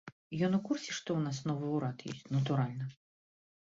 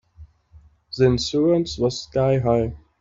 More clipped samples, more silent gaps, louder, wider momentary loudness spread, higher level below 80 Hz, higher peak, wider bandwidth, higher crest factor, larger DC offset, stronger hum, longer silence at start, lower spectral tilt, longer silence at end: neither; first, 0.12-0.31 s vs none; second, -35 LUFS vs -21 LUFS; first, 11 LU vs 5 LU; second, -72 dBFS vs -44 dBFS; second, -20 dBFS vs -4 dBFS; about the same, 7.8 kHz vs 7.8 kHz; about the same, 16 dB vs 16 dB; neither; neither; second, 0.05 s vs 0.2 s; about the same, -6.5 dB/octave vs -6.5 dB/octave; first, 0.75 s vs 0.25 s